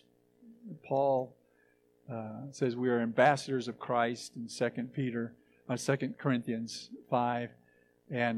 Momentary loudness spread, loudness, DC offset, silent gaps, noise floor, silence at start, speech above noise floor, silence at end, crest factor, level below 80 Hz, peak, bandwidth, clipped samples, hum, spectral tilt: 16 LU; -33 LUFS; under 0.1%; none; -69 dBFS; 0.45 s; 36 dB; 0 s; 22 dB; -80 dBFS; -10 dBFS; 13 kHz; under 0.1%; 60 Hz at -55 dBFS; -5.5 dB/octave